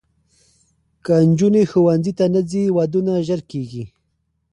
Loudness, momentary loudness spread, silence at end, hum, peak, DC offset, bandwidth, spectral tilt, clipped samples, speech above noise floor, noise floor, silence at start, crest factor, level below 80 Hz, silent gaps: -17 LUFS; 16 LU; 0.65 s; none; -4 dBFS; under 0.1%; 10.5 kHz; -8 dB/octave; under 0.1%; 53 dB; -69 dBFS; 1.05 s; 14 dB; -54 dBFS; none